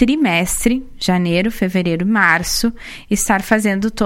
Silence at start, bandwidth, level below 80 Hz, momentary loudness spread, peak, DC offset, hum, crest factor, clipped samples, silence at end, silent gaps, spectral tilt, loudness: 0 s; 16.5 kHz; -34 dBFS; 6 LU; 0 dBFS; under 0.1%; none; 16 dB; under 0.1%; 0 s; none; -4 dB/octave; -16 LUFS